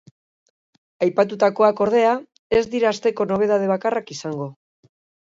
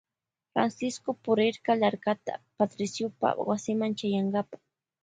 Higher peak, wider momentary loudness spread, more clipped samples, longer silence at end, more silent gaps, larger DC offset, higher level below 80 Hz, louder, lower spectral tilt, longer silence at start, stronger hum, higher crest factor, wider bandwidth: first, -4 dBFS vs -10 dBFS; first, 12 LU vs 8 LU; neither; first, 0.8 s vs 0.5 s; first, 2.39-2.50 s vs none; neither; first, -58 dBFS vs -74 dBFS; first, -20 LUFS vs -29 LUFS; about the same, -5.5 dB/octave vs -5.5 dB/octave; first, 1 s vs 0.55 s; neither; about the same, 18 dB vs 20 dB; second, 7.8 kHz vs 9.4 kHz